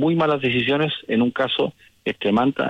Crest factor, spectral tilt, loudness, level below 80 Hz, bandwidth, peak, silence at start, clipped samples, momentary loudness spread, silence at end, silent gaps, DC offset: 12 dB; -7.5 dB/octave; -21 LUFS; -58 dBFS; 8.4 kHz; -8 dBFS; 0 s; under 0.1%; 7 LU; 0 s; none; under 0.1%